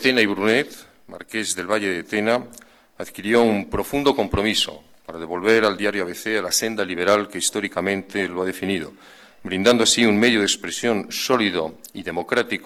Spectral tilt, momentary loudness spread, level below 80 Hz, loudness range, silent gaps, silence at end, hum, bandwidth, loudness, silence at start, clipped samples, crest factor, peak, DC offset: -3 dB/octave; 14 LU; -48 dBFS; 3 LU; none; 0 s; none; 18 kHz; -21 LUFS; 0 s; under 0.1%; 16 dB; -6 dBFS; under 0.1%